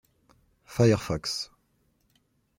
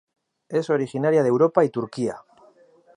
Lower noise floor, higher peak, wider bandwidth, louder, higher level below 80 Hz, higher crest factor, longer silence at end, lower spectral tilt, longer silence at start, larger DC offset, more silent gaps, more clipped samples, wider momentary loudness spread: first, -70 dBFS vs -55 dBFS; second, -10 dBFS vs -4 dBFS; first, 16.5 kHz vs 10.5 kHz; second, -27 LUFS vs -22 LUFS; first, -56 dBFS vs -70 dBFS; about the same, 20 dB vs 20 dB; first, 1.15 s vs 0.8 s; second, -5.5 dB/octave vs -7.5 dB/octave; first, 0.7 s vs 0.5 s; neither; neither; neither; first, 14 LU vs 10 LU